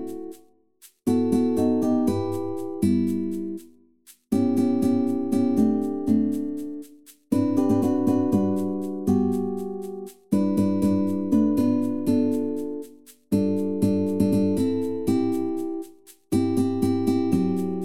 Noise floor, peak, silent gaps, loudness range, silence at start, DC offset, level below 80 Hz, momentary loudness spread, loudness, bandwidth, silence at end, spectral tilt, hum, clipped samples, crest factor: -56 dBFS; -8 dBFS; none; 1 LU; 0 s; 0.7%; -54 dBFS; 11 LU; -24 LUFS; 15.5 kHz; 0 s; -8 dB/octave; none; under 0.1%; 16 dB